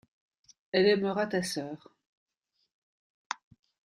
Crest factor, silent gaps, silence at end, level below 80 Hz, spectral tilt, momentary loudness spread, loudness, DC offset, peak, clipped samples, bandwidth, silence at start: 22 dB; 2.07-2.27 s, 2.74-3.30 s; 0.65 s; -72 dBFS; -4.5 dB/octave; 16 LU; -30 LUFS; under 0.1%; -12 dBFS; under 0.1%; 14 kHz; 0.75 s